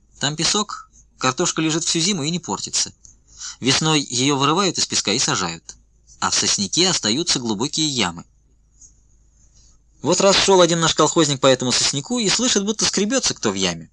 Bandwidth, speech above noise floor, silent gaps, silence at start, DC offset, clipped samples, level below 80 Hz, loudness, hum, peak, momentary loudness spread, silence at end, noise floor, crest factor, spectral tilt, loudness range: 11 kHz; 37 dB; none; 0.2 s; under 0.1%; under 0.1%; -52 dBFS; -18 LUFS; none; -2 dBFS; 9 LU; 0.05 s; -56 dBFS; 18 dB; -2.5 dB/octave; 5 LU